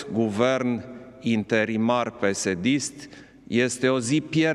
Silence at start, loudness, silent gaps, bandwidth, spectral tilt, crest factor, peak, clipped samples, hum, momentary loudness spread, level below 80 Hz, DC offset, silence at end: 0 s; -24 LUFS; none; 12.5 kHz; -5 dB/octave; 18 dB; -8 dBFS; under 0.1%; none; 10 LU; -62 dBFS; under 0.1%; 0 s